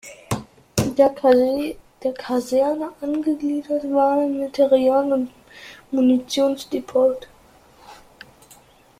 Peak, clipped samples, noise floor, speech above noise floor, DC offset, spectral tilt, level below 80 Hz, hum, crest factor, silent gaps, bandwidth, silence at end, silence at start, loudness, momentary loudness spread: -2 dBFS; under 0.1%; -51 dBFS; 32 dB; under 0.1%; -5.5 dB/octave; -54 dBFS; none; 20 dB; none; 15.5 kHz; 1.05 s; 0.05 s; -21 LUFS; 13 LU